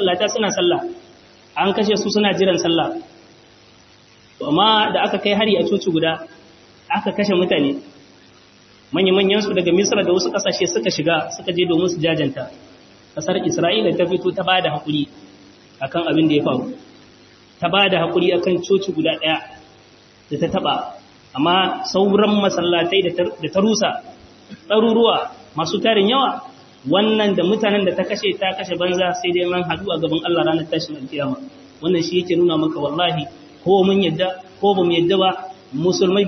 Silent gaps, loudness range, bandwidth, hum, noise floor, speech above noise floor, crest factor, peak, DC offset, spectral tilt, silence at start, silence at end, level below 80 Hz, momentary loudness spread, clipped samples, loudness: none; 3 LU; 6.4 kHz; none; -49 dBFS; 31 dB; 18 dB; -2 dBFS; under 0.1%; -4.5 dB/octave; 0 s; 0 s; -60 dBFS; 10 LU; under 0.1%; -18 LUFS